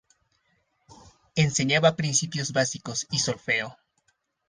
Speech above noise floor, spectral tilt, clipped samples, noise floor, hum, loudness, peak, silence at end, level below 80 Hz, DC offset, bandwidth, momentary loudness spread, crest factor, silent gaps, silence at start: 46 dB; -3.5 dB/octave; under 0.1%; -72 dBFS; none; -25 LUFS; -4 dBFS; 0.75 s; -62 dBFS; under 0.1%; 10 kHz; 8 LU; 22 dB; none; 0.9 s